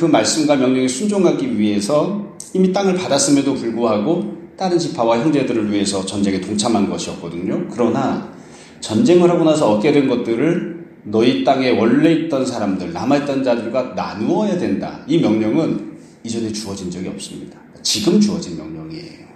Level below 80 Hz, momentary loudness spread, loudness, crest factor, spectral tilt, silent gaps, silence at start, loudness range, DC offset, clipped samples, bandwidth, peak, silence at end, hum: -56 dBFS; 13 LU; -17 LUFS; 16 dB; -5 dB/octave; none; 0 s; 5 LU; under 0.1%; under 0.1%; 13.5 kHz; 0 dBFS; 0.05 s; none